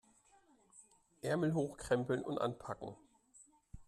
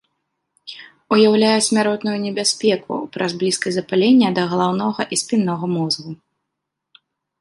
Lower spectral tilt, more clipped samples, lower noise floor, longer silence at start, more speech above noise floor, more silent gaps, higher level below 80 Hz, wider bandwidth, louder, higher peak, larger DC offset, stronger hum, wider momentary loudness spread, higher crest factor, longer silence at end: first, -6.5 dB/octave vs -4 dB/octave; neither; second, -69 dBFS vs -79 dBFS; about the same, 0.75 s vs 0.65 s; second, 32 dB vs 62 dB; neither; about the same, -66 dBFS vs -64 dBFS; first, 13.5 kHz vs 11.5 kHz; second, -38 LUFS vs -18 LUFS; second, -22 dBFS vs -2 dBFS; neither; neither; second, 12 LU vs 16 LU; about the same, 20 dB vs 16 dB; second, 0.05 s vs 1.25 s